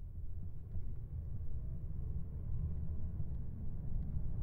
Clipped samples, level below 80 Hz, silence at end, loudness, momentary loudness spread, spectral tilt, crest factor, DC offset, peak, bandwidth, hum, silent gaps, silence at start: under 0.1%; -42 dBFS; 0 s; -45 LUFS; 6 LU; -12 dB/octave; 10 dB; under 0.1%; -28 dBFS; 1.6 kHz; none; none; 0 s